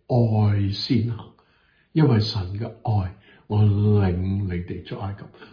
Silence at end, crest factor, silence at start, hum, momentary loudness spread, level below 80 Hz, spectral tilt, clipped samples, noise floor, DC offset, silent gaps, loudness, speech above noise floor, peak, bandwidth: 0.05 s; 16 dB; 0.1 s; none; 13 LU; -48 dBFS; -8.5 dB/octave; under 0.1%; -61 dBFS; under 0.1%; none; -23 LUFS; 40 dB; -6 dBFS; 5.2 kHz